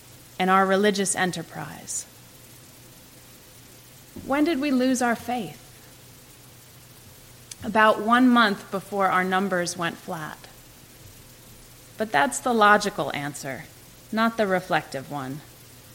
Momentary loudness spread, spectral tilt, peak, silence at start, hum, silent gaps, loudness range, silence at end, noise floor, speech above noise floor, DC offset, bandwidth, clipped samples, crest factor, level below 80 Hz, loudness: 19 LU; -4 dB/octave; -4 dBFS; 0.4 s; none; none; 7 LU; 0.15 s; -49 dBFS; 25 dB; under 0.1%; 17 kHz; under 0.1%; 22 dB; -60 dBFS; -23 LUFS